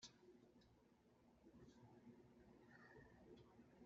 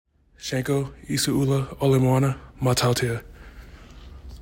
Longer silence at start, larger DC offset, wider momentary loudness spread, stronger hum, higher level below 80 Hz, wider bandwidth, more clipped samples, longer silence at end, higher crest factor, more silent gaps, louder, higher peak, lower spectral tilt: second, 0 s vs 0.4 s; neither; second, 3 LU vs 13 LU; neither; second, -84 dBFS vs -46 dBFS; second, 7.2 kHz vs 16.5 kHz; neither; about the same, 0 s vs 0 s; first, 22 dB vs 16 dB; neither; second, -68 LUFS vs -23 LUFS; second, -46 dBFS vs -8 dBFS; about the same, -4.5 dB/octave vs -5.5 dB/octave